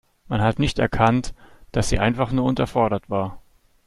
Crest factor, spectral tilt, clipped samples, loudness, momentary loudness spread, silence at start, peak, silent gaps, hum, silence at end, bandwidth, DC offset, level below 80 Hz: 20 dB; -6 dB/octave; under 0.1%; -22 LUFS; 9 LU; 0.3 s; -2 dBFS; none; none; 0.5 s; 12.5 kHz; under 0.1%; -36 dBFS